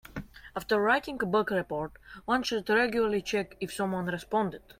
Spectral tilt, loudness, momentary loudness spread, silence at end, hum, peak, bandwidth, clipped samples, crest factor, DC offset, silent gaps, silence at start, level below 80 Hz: -5 dB/octave; -29 LUFS; 15 LU; 0.2 s; none; -14 dBFS; 16.5 kHz; under 0.1%; 16 dB; under 0.1%; none; 0.15 s; -56 dBFS